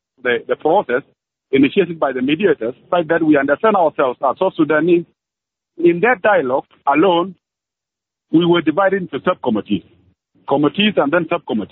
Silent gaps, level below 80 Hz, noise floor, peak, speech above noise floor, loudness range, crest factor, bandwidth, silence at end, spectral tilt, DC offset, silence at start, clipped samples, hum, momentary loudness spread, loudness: none; -62 dBFS; -85 dBFS; -2 dBFS; 69 dB; 2 LU; 14 dB; 4.1 kHz; 0.05 s; -4 dB/octave; under 0.1%; 0.25 s; under 0.1%; none; 7 LU; -16 LUFS